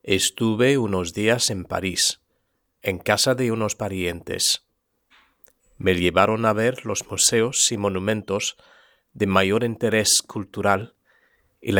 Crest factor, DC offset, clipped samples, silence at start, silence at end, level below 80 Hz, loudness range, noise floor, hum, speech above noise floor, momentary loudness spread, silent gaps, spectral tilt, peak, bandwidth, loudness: 22 dB; under 0.1%; under 0.1%; 0.05 s; 0 s; -54 dBFS; 3 LU; -72 dBFS; none; 50 dB; 9 LU; none; -3 dB/octave; 0 dBFS; over 20 kHz; -21 LUFS